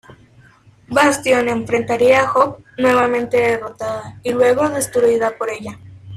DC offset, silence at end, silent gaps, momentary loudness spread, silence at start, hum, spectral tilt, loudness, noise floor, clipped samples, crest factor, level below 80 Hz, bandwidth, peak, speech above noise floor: under 0.1%; 0 s; none; 12 LU; 0.9 s; none; -4 dB/octave; -16 LUFS; -48 dBFS; under 0.1%; 16 dB; -52 dBFS; 15 kHz; -2 dBFS; 32 dB